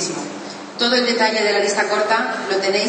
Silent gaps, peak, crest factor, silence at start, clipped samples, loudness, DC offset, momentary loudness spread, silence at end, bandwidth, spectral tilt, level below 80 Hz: none; -2 dBFS; 16 dB; 0 s; under 0.1%; -18 LUFS; under 0.1%; 13 LU; 0 s; 8.8 kHz; -2 dB/octave; -74 dBFS